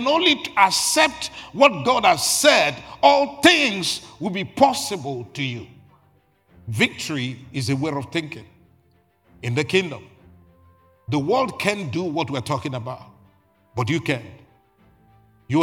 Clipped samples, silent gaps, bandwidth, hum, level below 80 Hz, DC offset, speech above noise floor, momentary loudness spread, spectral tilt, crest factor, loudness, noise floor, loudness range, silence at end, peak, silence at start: under 0.1%; none; 17.5 kHz; none; -60 dBFS; under 0.1%; 40 dB; 16 LU; -3.5 dB/octave; 22 dB; -20 LUFS; -61 dBFS; 11 LU; 0 s; 0 dBFS; 0 s